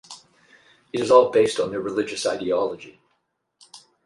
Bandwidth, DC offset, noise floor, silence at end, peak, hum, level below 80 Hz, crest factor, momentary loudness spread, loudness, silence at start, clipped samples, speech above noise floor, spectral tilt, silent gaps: 11.5 kHz; under 0.1%; -72 dBFS; 0.3 s; -2 dBFS; none; -64 dBFS; 22 dB; 21 LU; -21 LUFS; 0.1 s; under 0.1%; 52 dB; -4 dB/octave; none